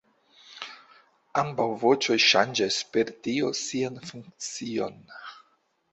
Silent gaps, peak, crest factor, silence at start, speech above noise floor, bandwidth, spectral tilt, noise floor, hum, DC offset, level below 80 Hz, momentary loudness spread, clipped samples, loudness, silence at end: none; -6 dBFS; 22 dB; 0.5 s; 42 dB; 8.2 kHz; -3 dB/octave; -69 dBFS; none; under 0.1%; -70 dBFS; 22 LU; under 0.1%; -25 LUFS; 0.55 s